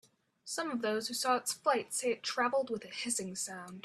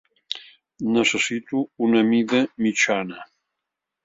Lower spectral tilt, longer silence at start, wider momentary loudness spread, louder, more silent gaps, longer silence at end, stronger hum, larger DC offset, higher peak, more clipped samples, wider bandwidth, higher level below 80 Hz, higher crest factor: second, -2 dB/octave vs -3.5 dB/octave; first, 0.45 s vs 0.3 s; second, 7 LU vs 14 LU; second, -34 LUFS vs -21 LUFS; neither; second, 0.05 s vs 0.8 s; neither; neither; second, -16 dBFS vs -6 dBFS; neither; first, 15.5 kHz vs 7.8 kHz; second, -80 dBFS vs -66 dBFS; about the same, 20 dB vs 18 dB